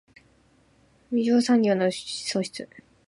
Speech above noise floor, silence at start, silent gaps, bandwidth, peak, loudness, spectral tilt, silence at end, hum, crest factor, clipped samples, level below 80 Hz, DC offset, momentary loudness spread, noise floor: 37 dB; 1.1 s; none; 11.5 kHz; -10 dBFS; -24 LUFS; -5 dB/octave; 0.3 s; none; 16 dB; under 0.1%; -68 dBFS; under 0.1%; 15 LU; -61 dBFS